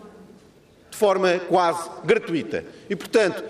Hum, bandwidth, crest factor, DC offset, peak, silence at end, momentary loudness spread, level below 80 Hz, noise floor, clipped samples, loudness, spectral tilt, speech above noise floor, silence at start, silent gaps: none; 15 kHz; 16 dB; under 0.1%; -6 dBFS; 0 s; 12 LU; -64 dBFS; -52 dBFS; under 0.1%; -22 LUFS; -4.5 dB/octave; 31 dB; 0 s; none